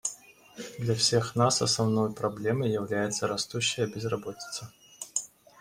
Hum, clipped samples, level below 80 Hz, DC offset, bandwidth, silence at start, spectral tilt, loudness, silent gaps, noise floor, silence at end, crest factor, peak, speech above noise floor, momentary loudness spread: none; under 0.1%; -64 dBFS; under 0.1%; 16 kHz; 0.05 s; -4 dB/octave; -28 LUFS; none; -50 dBFS; 0.35 s; 20 dB; -10 dBFS; 22 dB; 18 LU